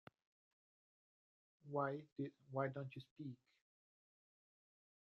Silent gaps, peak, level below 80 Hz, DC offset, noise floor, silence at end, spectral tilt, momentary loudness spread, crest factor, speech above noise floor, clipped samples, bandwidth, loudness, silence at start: 2.12-2.16 s, 3.11-3.16 s; -26 dBFS; under -90 dBFS; under 0.1%; under -90 dBFS; 1.65 s; -7 dB/octave; 11 LU; 24 dB; over 44 dB; under 0.1%; 6.2 kHz; -47 LUFS; 1.65 s